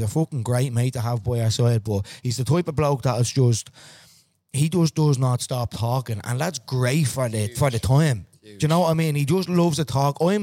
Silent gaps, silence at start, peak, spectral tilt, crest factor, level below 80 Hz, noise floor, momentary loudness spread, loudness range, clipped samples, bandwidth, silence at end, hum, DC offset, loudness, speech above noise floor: none; 0 s; -6 dBFS; -6 dB/octave; 16 dB; -50 dBFS; -56 dBFS; 7 LU; 2 LU; under 0.1%; 16.5 kHz; 0 s; none; under 0.1%; -22 LUFS; 35 dB